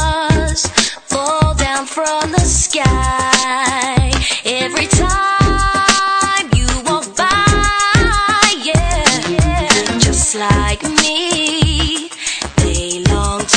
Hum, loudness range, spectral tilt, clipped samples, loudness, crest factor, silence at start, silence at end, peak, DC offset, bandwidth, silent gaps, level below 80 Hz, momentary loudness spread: none; 2 LU; -3 dB/octave; 0.1%; -13 LUFS; 14 dB; 0 s; 0 s; 0 dBFS; under 0.1%; 11 kHz; none; -22 dBFS; 5 LU